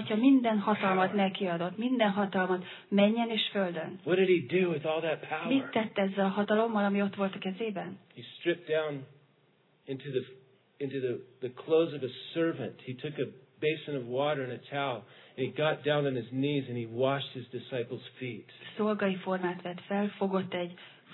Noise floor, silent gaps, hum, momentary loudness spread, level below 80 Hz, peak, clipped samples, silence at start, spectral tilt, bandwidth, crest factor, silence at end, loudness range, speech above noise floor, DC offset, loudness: -67 dBFS; none; none; 13 LU; -86 dBFS; -12 dBFS; under 0.1%; 0 s; -9.5 dB/octave; 4.3 kHz; 18 dB; 0 s; 7 LU; 37 dB; under 0.1%; -31 LUFS